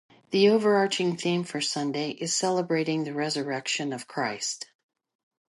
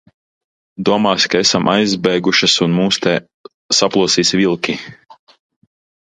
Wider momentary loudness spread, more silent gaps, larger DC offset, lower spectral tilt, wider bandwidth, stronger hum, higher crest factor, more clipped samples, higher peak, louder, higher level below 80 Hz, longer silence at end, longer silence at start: about the same, 9 LU vs 8 LU; second, none vs 3.34-3.44 s, 3.54-3.69 s; neither; about the same, -4 dB/octave vs -3.5 dB/octave; about the same, 11.5 kHz vs 11 kHz; neither; about the same, 18 dB vs 16 dB; neither; second, -10 dBFS vs 0 dBFS; second, -26 LUFS vs -14 LUFS; second, -78 dBFS vs -54 dBFS; about the same, 0.9 s vs 0.9 s; second, 0.3 s vs 0.8 s